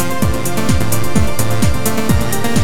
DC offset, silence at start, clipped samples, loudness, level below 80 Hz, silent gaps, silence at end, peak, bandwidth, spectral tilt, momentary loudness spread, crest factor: 20%; 0 s; under 0.1%; -17 LUFS; -26 dBFS; none; 0 s; 0 dBFS; 19.5 kHz; -5 dB/octave; 1 LU; 14 dB